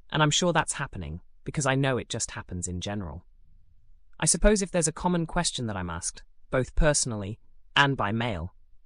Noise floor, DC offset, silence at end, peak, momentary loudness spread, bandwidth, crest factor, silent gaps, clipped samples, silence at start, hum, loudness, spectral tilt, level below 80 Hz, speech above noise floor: -52 dBFS; under 0.1%; 0.05 s; -8 dBFS; 15 LU; 12.5 kHz; 20 dB; none; under 0.1%; 0.05 s; none; -27 LUFS; -3.5 dB/octave; -38 dBFS; 26 dB